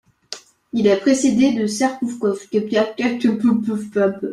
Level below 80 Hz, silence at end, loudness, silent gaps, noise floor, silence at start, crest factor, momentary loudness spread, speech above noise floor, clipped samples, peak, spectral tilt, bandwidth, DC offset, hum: -60 dBFS; 0 s; -19 LUFS; none; -38 dBFS; 0.3 s; 16 dB; 12 LU; 21 dB; under 0.1%; -4 dBFS; -5 dB/octave; 12.5 kHz; under 0.1%; none